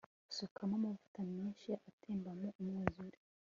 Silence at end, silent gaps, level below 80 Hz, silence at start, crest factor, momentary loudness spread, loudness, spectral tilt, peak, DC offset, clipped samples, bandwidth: 0.35 s; 0.51-0.56 s, 1.08-1.14 s, 1.93-1.98 s, 2.55-2.59 s; -70 dBFS; 0.3 s; 28 dB; 7 LU; -44 LUFS; -6 dB/octave; -16 dBFS; under 0.1%; under 0.1%; 7.4 kHz